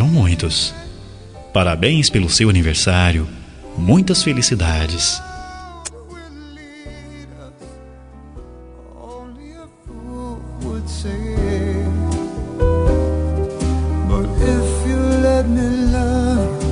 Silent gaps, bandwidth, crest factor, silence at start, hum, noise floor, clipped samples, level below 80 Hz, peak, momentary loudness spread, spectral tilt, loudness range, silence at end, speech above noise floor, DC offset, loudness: none; 11 kHz; 18 dB; 0 s; none; -39 dBFS; under 0.1%; -26 dBFS; 0 dBFS; 23 LU; -5 dB/octave; 21 LU; 0 s; 23 dB; under 0.1%; -17 LUFS